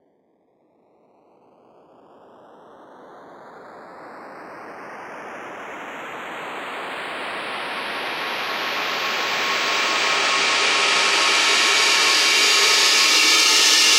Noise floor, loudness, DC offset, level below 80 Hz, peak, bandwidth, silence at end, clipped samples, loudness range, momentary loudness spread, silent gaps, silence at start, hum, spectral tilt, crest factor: -63 dBFS; -16 LUFS; under 0.1%; -74 dBFS; -2 dBFS; 16 kHz; 0 s; under 0.1%; 23 LU; 23 LU; none; 2.8 s; none; 1.5 dB/octave; 18 dB